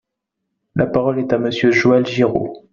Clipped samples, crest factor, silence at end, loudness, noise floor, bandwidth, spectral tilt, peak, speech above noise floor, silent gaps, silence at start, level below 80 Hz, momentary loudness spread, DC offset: under 0.1%; 16 dB; 0.15 s; -17 LUFS; -78 dBFS; 7.4 kHz; -5 dB/octave; -2 dBFS; 62 dB; none; 0.75 s; -50 dBFS; 8 LU; under 0.1%